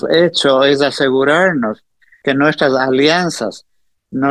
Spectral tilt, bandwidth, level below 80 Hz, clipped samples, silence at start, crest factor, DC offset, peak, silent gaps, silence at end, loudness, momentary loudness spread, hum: -4.5 dB/octave; 12.5 kHz; -58 dBFS; under 0.1%; 0.05 s; 14 dB; 0.1%; 0 dBFS; none; 0 s; -13 LUFS; 11 LU; none